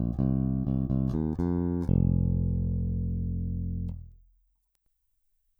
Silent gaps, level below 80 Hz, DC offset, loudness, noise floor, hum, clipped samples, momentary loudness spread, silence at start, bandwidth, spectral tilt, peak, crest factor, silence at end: none; -38 dBFS; under 0.1%; -29 LUFS; -74 dBFS; none; under 0.1%; 8 LU; 0 s; 1.8 kHz; -12 dB/octave; -14 dBFS; 16 dB; 1.45 s